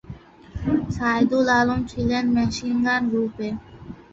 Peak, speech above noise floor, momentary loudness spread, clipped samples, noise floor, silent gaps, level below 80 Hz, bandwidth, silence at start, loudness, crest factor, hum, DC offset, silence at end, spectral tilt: -8 dBFS; 20 dB; 21 LU; under 0.1%; -42 dBFS; none; -42 dBFS; 7.8 kHz; 0.05 s; -22 LUFS; 16 dB; none; under 0.1%; 0.2 s; -6 dB/octave